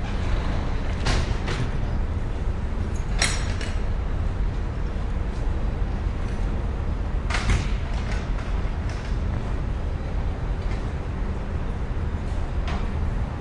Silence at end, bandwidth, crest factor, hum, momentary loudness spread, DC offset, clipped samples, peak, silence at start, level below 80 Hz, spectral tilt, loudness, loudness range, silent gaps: 0 s; 11.5 kHz; 20 dB; none; 5 LU; under 0.1%; under 0.1%; -6 dBFS; 0 s; -26 dBFS; -5.5 dB/octave; -28 LUFS; 3 LU; none